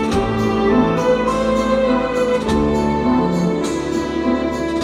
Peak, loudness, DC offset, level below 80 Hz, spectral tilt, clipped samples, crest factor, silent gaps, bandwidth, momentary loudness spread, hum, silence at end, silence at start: -4 dBFS; -17 LUFS; under 0.1%; -34 dBFS; -6.5 dB/octave; under 0.1%; 14 dB; none; 13 kHz; 5 LU; none; 0 s; 0 s